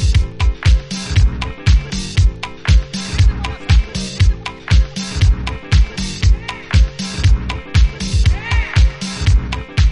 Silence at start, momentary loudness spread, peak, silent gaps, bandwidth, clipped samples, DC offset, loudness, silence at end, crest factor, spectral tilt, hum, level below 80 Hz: 0 s; 4 LU; -2 dBFS; none; 11 kHz; under 0.1%; under 0.1%; -17 LUFS; 0 s; 12 dB; -5 dB/octave; none; -16 dBFS